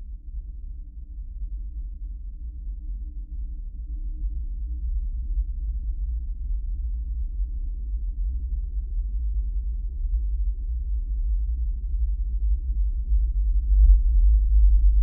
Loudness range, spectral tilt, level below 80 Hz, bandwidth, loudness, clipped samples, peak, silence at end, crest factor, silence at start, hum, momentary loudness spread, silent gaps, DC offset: 12 LU; -20 dB/octave; -24 dBFS; 0.4 kHz; -28 LUFS; under 0.1%; -6 dBFS; 0 s; 18 dB; 0 s; none; 17 LU; none; under 0.1%